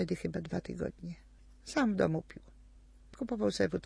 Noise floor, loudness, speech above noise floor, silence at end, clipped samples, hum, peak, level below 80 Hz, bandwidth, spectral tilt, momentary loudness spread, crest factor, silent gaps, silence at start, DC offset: -57 dBFS; -35 LUFS; 23 dB; 0.05 s; under 0.1%; none; -16 dBFS; -56 dBFS; 11 kHz; -6 dB/octave; 21 LU; 20 dB; none; 0 s; under 0.1%